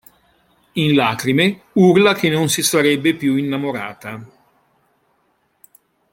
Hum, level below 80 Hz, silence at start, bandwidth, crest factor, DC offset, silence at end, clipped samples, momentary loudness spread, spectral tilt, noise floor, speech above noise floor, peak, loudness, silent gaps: none; -60 dBFS; 0.75 s; 16.5 kHz; 18 dB; under 0.1%; 1.85 s; under 0.1%; 15 LU; -4.5 dB/octave; -64 dBFS; 48 dB; -2 dBFS; -16 LUFS; none